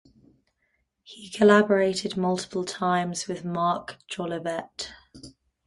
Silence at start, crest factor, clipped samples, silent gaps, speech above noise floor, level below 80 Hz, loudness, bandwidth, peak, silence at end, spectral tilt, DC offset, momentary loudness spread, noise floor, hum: 1.1 s; 22 dB; under 0.1%; none; 49 dB; -64 dBFS; -25 LUFS; 11.5 kHz; -4 dBFS; 0.35 s; -5 dB/octave; under 0.1%; 18 LU; -74 dBFS; none